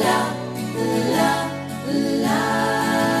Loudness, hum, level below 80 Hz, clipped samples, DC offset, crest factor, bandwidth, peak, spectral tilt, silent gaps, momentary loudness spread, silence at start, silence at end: -21 LUFS; none; -60 dBFS; under 0.1%; under 0.1%; 16 dB; 14 kHz; -6 dBFS; -4.5 dB/octave; none; 8 LU; 0 s; 0 s